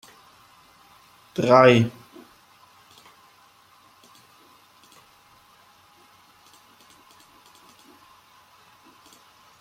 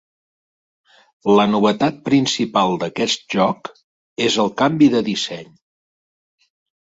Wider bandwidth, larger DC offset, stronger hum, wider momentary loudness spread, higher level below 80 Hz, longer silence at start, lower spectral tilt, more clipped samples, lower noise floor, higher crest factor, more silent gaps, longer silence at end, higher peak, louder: first, 16 kHz vs 8 kHz; neither; neither; first, 22 LU vs 11 LU; second, -68 dBFS vs -60 dBFS; first, 1.4 s vs 1.25 s; first, -6.5 dB/octave vs -5 dB/octave; neither; second, -56 dBFS vs under -90 dBFS; first, 26 dB vs 16 dB; second, none vs 3.84-4.16 s; first, 7.7 s vs 1.4 s; about the same, -2 dBFS vs -2 dBFS; about the same, -18 LUFS vs -18 LUFS